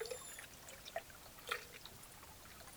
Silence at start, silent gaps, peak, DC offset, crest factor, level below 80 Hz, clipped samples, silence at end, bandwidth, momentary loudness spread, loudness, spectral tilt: 0 s; none; -22 dBFS; under 0.1%; 28 dB; -68 dBFS; under 0.1%; 0 s; over 20 kHz; 10 LU; -50 LUFS; -1.5 dB/octave